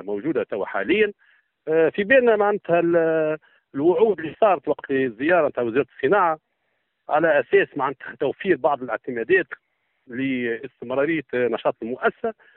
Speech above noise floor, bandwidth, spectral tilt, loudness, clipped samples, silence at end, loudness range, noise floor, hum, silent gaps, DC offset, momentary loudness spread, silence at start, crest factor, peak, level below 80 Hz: 52 dB; 4.1 kHz; -4 dB/octave; -22 LUFS; under 0.1%; 0.25 s; 4 LU; -73 dBFS; none; none; under 0.1%; 9 LU; 0 s; 18 dB; -4 dBFS; -64 dBFS